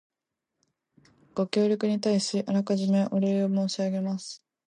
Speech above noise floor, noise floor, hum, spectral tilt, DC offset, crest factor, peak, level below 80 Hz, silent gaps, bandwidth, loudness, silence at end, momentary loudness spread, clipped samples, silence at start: 60 dB; -85 dBFS; none; -6 dB/octave; under 0.1%; 20 dB; -8 dBFS; -76 dBFS; none; 10 kHz; -27 LUFS; 0.35 s; 10 LU; under 0.1%; 1.35 s